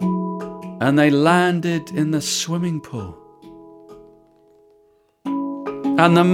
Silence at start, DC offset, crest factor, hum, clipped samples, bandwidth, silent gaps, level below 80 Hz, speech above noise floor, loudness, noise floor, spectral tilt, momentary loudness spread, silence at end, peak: 0 s; under 0.1%; 18 dB; none; under 0.1%; 16 kHz; none; -60 dBFS; 41 dB; -19 LUFS; -58 dBFS; -5.5 dB/octave; 17 LU; 0 s; -2 dBFS